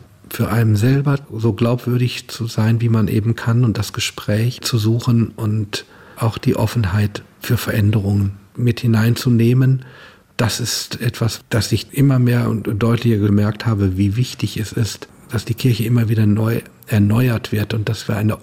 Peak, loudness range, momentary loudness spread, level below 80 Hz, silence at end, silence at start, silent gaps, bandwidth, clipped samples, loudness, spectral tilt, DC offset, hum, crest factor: -4 dBFS; 2 LU; 7 LU; -48 dBFS; 0 s; 0.3 s; none; 16.5 kHz; under 0.1%; -18 LUFS; -6.5 dB/octave; under 0.1%; none; 12 dB